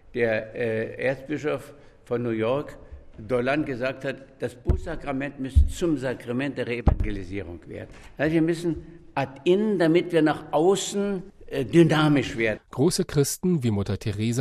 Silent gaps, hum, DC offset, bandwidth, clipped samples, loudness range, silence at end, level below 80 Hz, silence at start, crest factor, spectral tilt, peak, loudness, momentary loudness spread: none; none; under 0.1%; 13.5 kHz; under 0.1%; 6 LU; 0 s; -34 dBFS; 0.05 s; 18 dB; -6 dB/octave; -6 dBFS; -25 LUFS; 13 LU